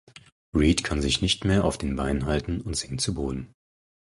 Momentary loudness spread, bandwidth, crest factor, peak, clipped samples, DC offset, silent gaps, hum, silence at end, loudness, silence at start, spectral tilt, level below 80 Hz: 8 LU; 11.5 kHz; 18 dB; -10 dBFS; under 0.1%; under 0.1%; 0.32-0.52 s; none; 0.75 s; -25 LUFS; 0.15 s; -4.5 dB/octave; -36 dBFS